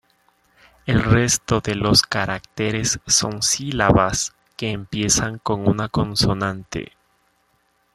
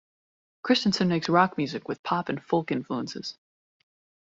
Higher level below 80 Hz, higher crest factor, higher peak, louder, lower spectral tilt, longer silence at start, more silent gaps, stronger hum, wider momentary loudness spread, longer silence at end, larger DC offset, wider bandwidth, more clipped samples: first, -40 dBFS vs -66 dBFS; about the same, 20 dB vs 22 dB; first, -2 dBFS vs -6 dBFS; first, -19 LUFS vs -26 LUFS; second, -3.5 dB/octave vs -5.5 dB/octave; first, 0.85 s vs 0.65 s; second, none vs 1.99-2.04 s; neither; about the same, 11 LU vs 13 LU; first, 1.1 s vs 0.9 s; neither; first, 13.5 kHz vs 7.8 kHz; neither